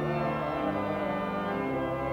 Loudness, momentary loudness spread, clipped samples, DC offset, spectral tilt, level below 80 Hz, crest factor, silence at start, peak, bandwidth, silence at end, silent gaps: -31 LUFS; 1 LU; under 0.1%; under 0.1%; -8 dB/octave; -52 dBFS; 12 dB; 0 s; -18 dBFS; 20 kHz; 0 s; none